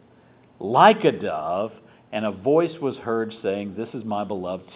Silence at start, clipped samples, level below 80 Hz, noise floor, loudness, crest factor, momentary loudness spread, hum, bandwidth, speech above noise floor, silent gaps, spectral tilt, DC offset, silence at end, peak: 0.6 s; under 0.1%; -62 dBFS; -54 dBFS; -23 LUFS; 22 dB; 16 LU; none; 4 kHz; 32 dB; none; -10 dB/octave; under 0.1%; 0 s; -2 dBFS